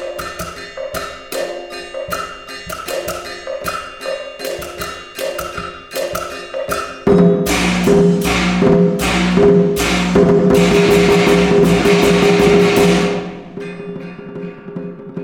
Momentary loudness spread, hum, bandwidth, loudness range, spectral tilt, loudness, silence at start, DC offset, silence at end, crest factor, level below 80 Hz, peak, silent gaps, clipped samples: 17 LU; none; 19 kHz; 13 LU; -5.5 dB/octave; -14 LUFS; 0 s; under 0.1%; 0 s; 14 dB; -34 dBFS; 0 dBFS; none; under 0.1%